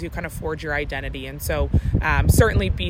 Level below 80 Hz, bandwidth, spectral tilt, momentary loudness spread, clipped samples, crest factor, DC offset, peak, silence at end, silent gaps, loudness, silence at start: -28 dBFS; 16.5 kHz; -5.5 dB/octave; 13 LU; under 0.1%; 16 dB; under 0.1%; -4 dBFS; 0 s; none; -22 LUFS; 0 s